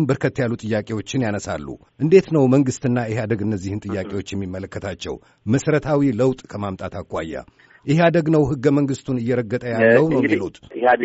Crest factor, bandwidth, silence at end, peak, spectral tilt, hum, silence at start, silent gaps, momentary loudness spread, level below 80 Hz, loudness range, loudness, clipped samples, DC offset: 18 dB; 8 kHz; 0 s; -2 dBFS; -6.5 dB/octave; none; 0 s; none; 14 LU; -50 dBFS; 5 LU; -20 LUFS; under 0.1%; under 0.1%